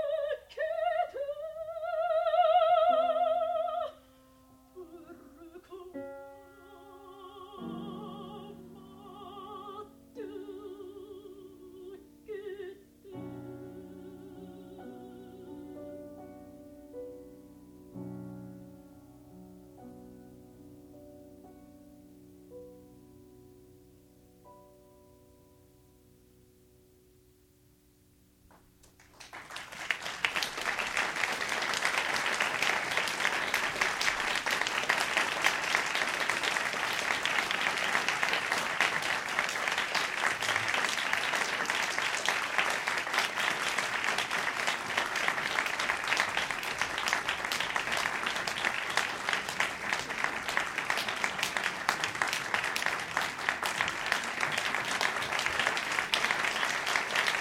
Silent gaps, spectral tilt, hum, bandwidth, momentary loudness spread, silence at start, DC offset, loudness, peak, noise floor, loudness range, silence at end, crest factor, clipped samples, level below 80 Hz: none; -1.5 dB/octave; none; 19 kHz; 21 LU; 0 s; under 0.1%; -30 LUFS; -6 dBFS; -64 dBFS; 19 LU; 0 s; 28 dB; under 0.1%; -66 dBFS